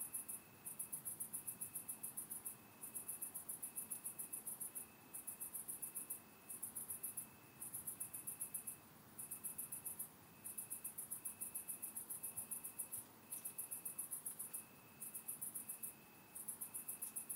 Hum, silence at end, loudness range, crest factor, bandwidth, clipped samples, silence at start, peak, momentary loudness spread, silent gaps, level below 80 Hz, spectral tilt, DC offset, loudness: none; 0 s; 1 LU; 22 dB; 17.5 kHz; under 0.1%; 0 s; -30 dBFS; 6 LU; none; -86 dBFS; -1.5 dB/octave; under 0.1%; -48 LUFS